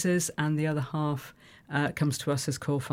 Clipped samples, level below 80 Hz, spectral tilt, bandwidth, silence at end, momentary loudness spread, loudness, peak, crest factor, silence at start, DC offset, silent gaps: under 0.1%; -62 dBFS; -5 dB/octave; 16.5 kHz; 0 s; 6 LU; -30 LUFS; -14 dBFS; 16 dB; 0 s; under 0.1%; none